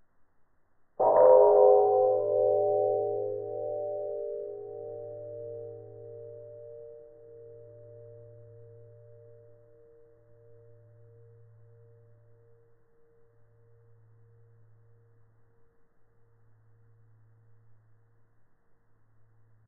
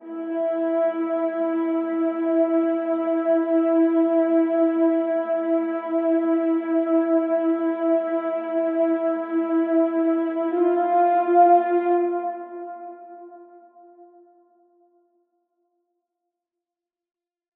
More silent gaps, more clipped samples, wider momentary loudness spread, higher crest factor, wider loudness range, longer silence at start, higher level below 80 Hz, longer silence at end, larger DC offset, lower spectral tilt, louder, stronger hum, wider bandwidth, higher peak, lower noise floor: neither; neither; first, 31 LU vs 6 LU; first, 24 dB vs 16 dB; first, 27 LU vs 3 LU; first, 1 s vs 0 s; first, -74 dBFS vs under -90 dBFS; first, 11.6 s vs 3.5 s; neither; about the same, -4 dB/octave vs -3.5 dB/octave; second, -25 LUFS vs -22 LUFS; neither; second, 2.1 kHz vs 3.5 kHz; about the same, -8 dBFS vs -6 dBFS; second, -63 dBFS vs -89 dBFS